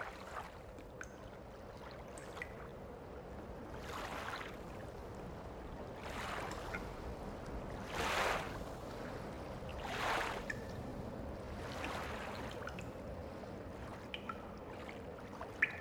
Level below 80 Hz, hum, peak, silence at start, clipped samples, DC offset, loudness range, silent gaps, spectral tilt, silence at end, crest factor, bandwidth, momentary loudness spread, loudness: -54 dBFS; none; -20 dBFS; 0 s; under 0.1%; under 0.1%; 8 LU; none; -4.5 dB/octave; 0 s; 26 dB; over 20 kHz; 13 LU; -45 LUFS